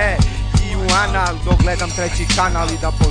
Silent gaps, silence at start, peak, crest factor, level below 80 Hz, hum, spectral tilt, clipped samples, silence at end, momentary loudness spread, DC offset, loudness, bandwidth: none; 0 s; -2 dBFS; 14 dB; -20 dBFS; none; -4.5 dB/octave; under 0.1%; 0 s; 4 LU; under 0.1%; -17 LUFS; 10 kHz